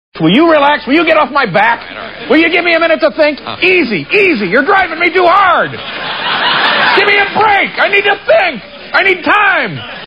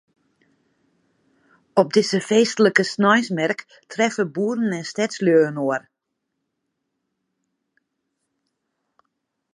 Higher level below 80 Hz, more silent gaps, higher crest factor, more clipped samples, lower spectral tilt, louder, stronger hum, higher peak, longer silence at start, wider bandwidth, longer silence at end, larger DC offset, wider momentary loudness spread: first, -48 dBFS vs -76 dBFS; neither; second, 10 dB vs 22 dB; neither; first, -6.5 dB/octave vs -4.5 dB/octave; first, -9 LUFS vs -20 LUFS; neither; about the same, 0 dBFS vs 0 dBFS; second, 0.15 s vs 1.75 s; second, 7.2 kHz vs 11 kHz; second, 0 s vs 3.75 s; first, 0.4% vs under 0.1%; about the same, 7 LU vs 8 LU